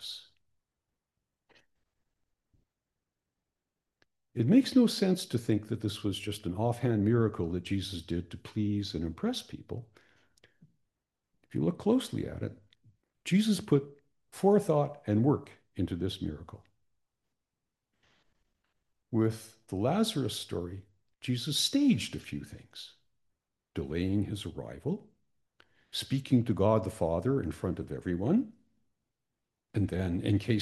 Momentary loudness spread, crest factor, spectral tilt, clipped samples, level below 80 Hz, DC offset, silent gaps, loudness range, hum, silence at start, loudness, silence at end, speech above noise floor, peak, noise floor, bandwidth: 16 LU; 20 dB; -6 dB/octave; under 0.1%; -62 dBFS; under 0.1%; none; 8 LU; none; 0 s; -31 LUFS; 0 s; 58 dB; -12 dBFS; -88 dBFS; 12.5 kHz